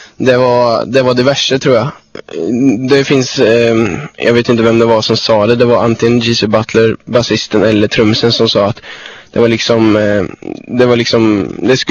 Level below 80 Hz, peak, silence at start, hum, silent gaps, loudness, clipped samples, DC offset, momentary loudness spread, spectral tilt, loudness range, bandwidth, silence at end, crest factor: -44 dBFS; 0 dBFS; 0 s; none; none; -10 LUFS; 0.6%; under 0.1%; 7 LU; -5.5 dB/octave; 2 LU; 8.2 kHz; 0 s; 10 dB